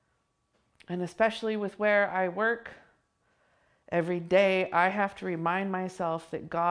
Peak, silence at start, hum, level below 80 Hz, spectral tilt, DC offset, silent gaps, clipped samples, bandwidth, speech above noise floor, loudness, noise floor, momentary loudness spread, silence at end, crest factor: -10 dBFS; 0.9 s; none; -70 dBFS; -6 dB/octave; under 0.1%; none; under 0.1%; 10.5 kHz; 47 dB; -29 LUFS; -75 dBFS; 11 LU; 0 s; 20 dB